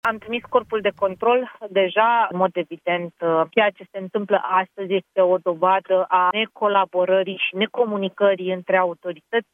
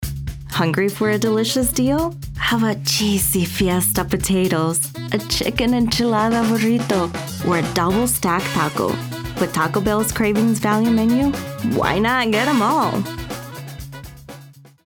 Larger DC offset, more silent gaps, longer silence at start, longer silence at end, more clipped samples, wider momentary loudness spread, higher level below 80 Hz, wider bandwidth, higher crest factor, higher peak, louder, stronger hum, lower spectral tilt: neither; neither; about the same, 0.05 s vs 0 s; second, 0.1 s vs 0.25 s; neither; second, 7 LU vs 10 LU; second, -70 dBFS vs -38 dBFS; second, 4 kHz vs over 20 kHz; about the same, 18 dB vs 16 dB; about the same, -2 dBFS vs -4 dBFS; about the same, -21 LUFS vs -19 LUFS; neither; first, -7 dB/octave vs -4.5 dB/octave